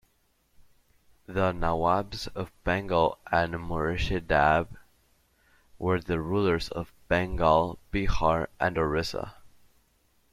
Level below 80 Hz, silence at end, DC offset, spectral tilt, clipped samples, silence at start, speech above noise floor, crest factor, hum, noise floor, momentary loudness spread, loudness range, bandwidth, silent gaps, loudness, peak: -42 dBFS; 0.85 s; under 0.1%; -6.5 dB/octave; under 0.1%; 0.6 s; 42 dB; 20 dB; none; -69 dBFS; 12 LU; 2 LU; 15 kHz; none; -28 LUFS; -8 dBFS